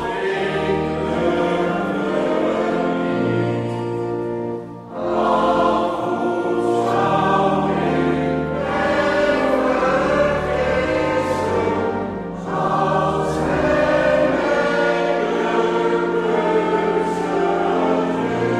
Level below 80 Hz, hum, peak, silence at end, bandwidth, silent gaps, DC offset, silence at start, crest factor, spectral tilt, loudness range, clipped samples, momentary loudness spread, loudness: -42 dBFS; none; -4 dBFS; 0 s; 12 kHz; none; under 0.1%; 0 s; 14 dB; -6.5 dB/octave; 3 LU; under 0.1%; 6 LU; -19 LUFS